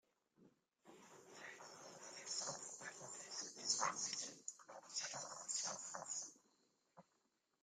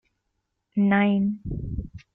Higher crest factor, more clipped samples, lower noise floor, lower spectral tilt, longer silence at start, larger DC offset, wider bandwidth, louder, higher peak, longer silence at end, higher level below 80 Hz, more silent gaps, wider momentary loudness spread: first, 26 dB vs 18 dB; neither; first, -84 dBFS vs -78 dBFS; second, 0 dB/octave vs -10 dB/octave; second, 0.4 s vs 0.75 s; neither; first, 15.5 kHz vs 3.8 kHz; second, -46 LUFS vs -24 LUFS; second, -24 dBFS vs -8 dBFS; first, 0.6 s vs 0.15 s; second, under -90 dBFS vs -42 dBFS; neither; first, 16 LU vs 13 LU